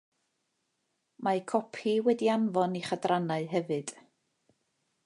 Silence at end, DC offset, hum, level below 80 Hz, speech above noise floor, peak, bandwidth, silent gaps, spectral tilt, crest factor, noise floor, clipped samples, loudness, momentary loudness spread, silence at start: 1.15 s; under 0.1%; none; -80 dBFS; 50 dB; -12 dBFS; 11.5 kHz; none; -6 dB/octave; 20 dB; -79 dBFS; under 0.1%; -30 LUFS; 8 LU; 1.2 s